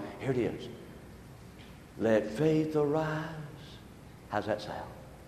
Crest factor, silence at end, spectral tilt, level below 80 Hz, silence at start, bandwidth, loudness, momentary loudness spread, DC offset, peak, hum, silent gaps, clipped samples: 18 dB; 0 s; -7 dB/octave; -58 dBFS; 0 s; 13.5 kHz; -32 LUFS; 22 LU; under 0.1%; -14 dBFS; none; none; under 0.1%